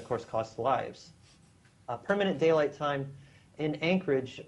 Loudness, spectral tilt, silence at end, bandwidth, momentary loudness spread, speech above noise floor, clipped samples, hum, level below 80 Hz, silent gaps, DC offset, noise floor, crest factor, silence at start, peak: -30 LUFS; -6.5 dB/octave; 0.05 s; 11 kHz; 16 LU; 31 dB; under 0.1%; none; -68 dBFS; none; under 0.1%; -61 dBFS; 18 dB; 0 s; -14 dBFS